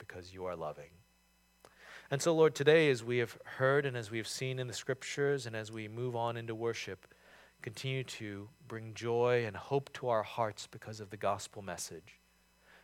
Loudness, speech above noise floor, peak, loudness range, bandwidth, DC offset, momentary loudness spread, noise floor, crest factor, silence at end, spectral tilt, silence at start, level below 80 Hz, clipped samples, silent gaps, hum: -35 LUFS; 35 dB; -12 dBFS; 8 LU; 16 kHz; under 0.1%; 18 LU; -70 dBFS; 24 dB; 0.7 s; -5 dB/octave; 0 s; -74 dBFS; under 0.1%; none; none